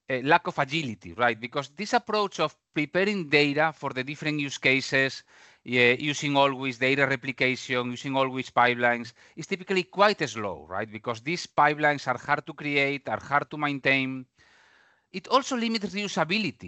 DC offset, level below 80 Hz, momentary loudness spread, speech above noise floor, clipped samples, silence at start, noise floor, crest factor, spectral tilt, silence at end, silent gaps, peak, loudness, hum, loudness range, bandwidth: under 0.1%; -70 dBFS; 11 LU; 35 dB; under 0.1%; 0.1 s; -62 dBFS; 22 dB; -4.5 dB/octave; 0 s; none; -6 dBFS; -26 LUFS; none; 3 LU; 8.4 kHz